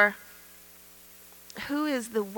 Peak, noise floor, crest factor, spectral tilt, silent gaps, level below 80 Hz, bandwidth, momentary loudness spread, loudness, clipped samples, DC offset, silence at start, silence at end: -8 dBFS; -52 dBFS; 22 dB; -3.5 dB/octave; none; -68 dBFS; 18 kHz; 20 LU; -30 LUFS; under 0.1%; under 0.1%; 0 s; 0 s